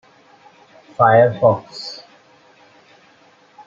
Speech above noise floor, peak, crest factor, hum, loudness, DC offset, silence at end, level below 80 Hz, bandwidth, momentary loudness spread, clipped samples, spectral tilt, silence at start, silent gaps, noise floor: 37 dB; -2 dBFS; 18 dB; none; -15 LUFS; under 0.1%; 1.7 s; -64 dBFS; 7.6 kHz; 23 LU; under 0.1%; -6.5 dB/octave; 1 s; none; -52 dBFS